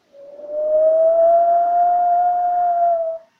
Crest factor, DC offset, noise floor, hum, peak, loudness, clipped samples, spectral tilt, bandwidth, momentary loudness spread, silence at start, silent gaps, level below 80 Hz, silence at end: 8 dB; under 0.1%; -38 dBFS; none; -8 dBFS; -16 LUFS; under 0.1%; -6 dB/octave; 2 kHz; 7 LU; 0.2 s; none; -62 dBFS; 0.2 s